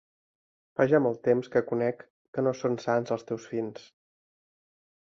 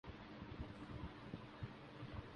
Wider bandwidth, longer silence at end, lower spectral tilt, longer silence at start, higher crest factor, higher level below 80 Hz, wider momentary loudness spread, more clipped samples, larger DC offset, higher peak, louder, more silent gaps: second, 7.2 kHz vs 10.5 kHz; first, 1.2 s vs 0 s; about the same, -7 dB/octave vs -7.5 dB/octave; first, 0.8 s vs 0.05 s; about the same, 20 dB vs 18 dB; second, -72 dBFS vs -60 dBFS; first, 13 LU vs 3 LU; neither; neither; first, -10 dBFS vs -34 dBFS; first, -28 LUFS vs -53 LUFS; first, 2.10-2.33 s vs none